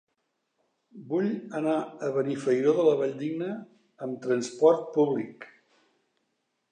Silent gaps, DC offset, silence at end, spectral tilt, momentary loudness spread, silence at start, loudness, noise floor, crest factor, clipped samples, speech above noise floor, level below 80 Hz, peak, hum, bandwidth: none; under 0.1%; 1.25 s; -6.5 dB/octave; 14 LU; 0.95 s; -27 LUFS; -78 dBFS; 20 dB; under 0.1%; 52 dB; -86 dBFS; -8 dBFS; none; 9.6 kHz